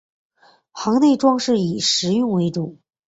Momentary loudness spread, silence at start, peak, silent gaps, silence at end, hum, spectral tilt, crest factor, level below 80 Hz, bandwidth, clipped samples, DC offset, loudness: 11 LU; 0.75 s; -4 dBFS; none; 0.35 s; none; -5 dB/octave; 16 dB; -62 dBFS; 8 kHz; under 0.1%; under 0.1%; -18 LUFS